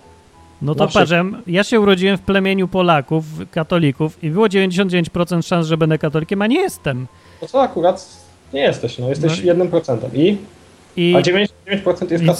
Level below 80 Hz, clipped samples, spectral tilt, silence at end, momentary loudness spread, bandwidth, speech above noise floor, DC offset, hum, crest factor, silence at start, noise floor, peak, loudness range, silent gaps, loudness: -48 dBFS; under 0.1%; -6 dB/octave; 0 s; 9 LU; 14 kHz; 29 dB; under 0.1%; none; 16 dB; 0.6 s; -45 dBFS; 0 dBFS; 3 LU; none; -17 LUFS